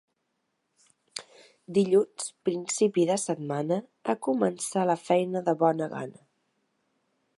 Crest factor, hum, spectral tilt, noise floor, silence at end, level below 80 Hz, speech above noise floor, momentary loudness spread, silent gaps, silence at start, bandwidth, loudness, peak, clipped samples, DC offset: 20 dB; none; -5 dB/octave; -78 dBFS; 1.25 s; -80 dBFS; 52 dB; 14 LU; none; 1.15 s; 11.5 kHz; -27 LUFS; -8 dBFS; under 0.1%; under 0.1%